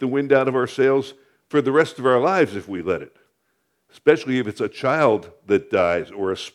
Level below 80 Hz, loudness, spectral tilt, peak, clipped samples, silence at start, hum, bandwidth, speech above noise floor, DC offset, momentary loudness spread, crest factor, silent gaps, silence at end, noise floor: -62 dBFS; -20 LUFS; -6 dB/octave; -2 dBFS; under 0.1%; 0 s; none; 12 kHz; 50 dB; under 0.1%; 8 LU; 18 dB; none; 0.05 s; -70 dBFS